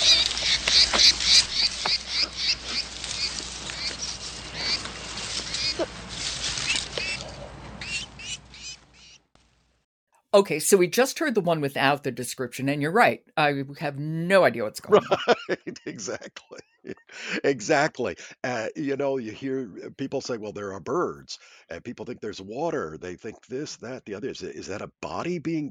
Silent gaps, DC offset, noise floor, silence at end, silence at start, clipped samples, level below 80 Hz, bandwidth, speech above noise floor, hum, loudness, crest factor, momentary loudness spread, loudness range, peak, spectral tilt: 9.84-10.07 s; under 0.1%; -63 dBFS; 0 s; 0 s; under 0.1%; -52 dBFS; 17.5 kHz; 37 dB; none; -24 LUFS; 22 dB; 17 LU; 10 LU; -4 dBFS; -2.5 dB/octave